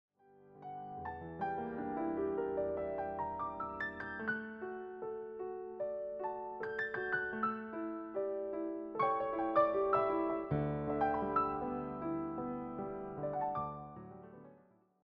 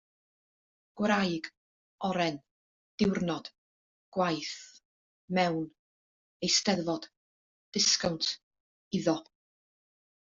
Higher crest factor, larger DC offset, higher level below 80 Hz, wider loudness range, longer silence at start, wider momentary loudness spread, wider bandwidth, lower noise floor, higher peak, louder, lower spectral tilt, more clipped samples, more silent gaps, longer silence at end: about the same, 20 dB vs 22 dB; neither; about the same, -64 dBFS vs -68 dBFS; first, 7 LU vs 4 LU; second, 0.35 s vs 0.95 s; second, 12 LU vs 17 LU; second, 5.8 kHz vs 7.6 kHz; second, -66 dBFS vs under -90 dBFS; second, -18 dBFS vs -12 dBFS; second, -38 LUFS vs -30 LUFS; first, -6 dB/octave vs -3 dB/octave; neither; second, none vs 1.57-1.99 s, 2.51-2.98 s, 3.58-4.12 s, 4.85-5.28 s, 5.79-6.40 s, 7.17-7.72 s, 8.43-8.51 s, 8.60-8.91 s; second, 0.5 s vs 1 s